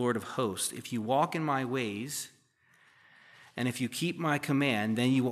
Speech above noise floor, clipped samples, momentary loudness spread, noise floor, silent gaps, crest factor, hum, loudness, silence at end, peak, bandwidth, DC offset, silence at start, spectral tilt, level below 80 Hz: 35 dB; under 0.1%; 8 LU; -66 dBFS; none; 18 dB; none; -31 LUFS; 0 s; -14 dBFS; 15 kHz; under 0.1%; 0 s; -5 dB/octave; -80 dBFS